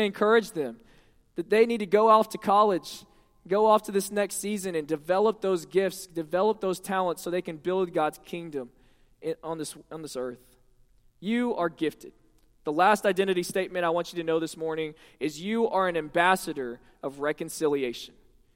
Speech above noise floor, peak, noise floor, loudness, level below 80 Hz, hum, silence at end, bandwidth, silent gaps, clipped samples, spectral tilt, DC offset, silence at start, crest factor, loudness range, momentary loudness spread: 34 dB; -6 dBFS; -60 dBFS; -27 LUFS; -64 dBFS; none; 0.5 s; 16.5 kHz; none; under 0.1%; -4.5 dB/octave; under 0.1%; 0 s; 20 dB; 9 LU; 16 LU